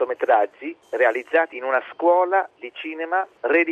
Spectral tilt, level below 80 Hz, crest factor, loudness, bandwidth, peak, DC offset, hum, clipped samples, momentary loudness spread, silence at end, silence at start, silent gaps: -4.5 dB/octave; -78 dBFS; 16 dB; -21 LUFS; 6.8 kHz; -4 dBFS; under 0.1%; none; under 0.1%; 13 LU; 0 s; 0 s; none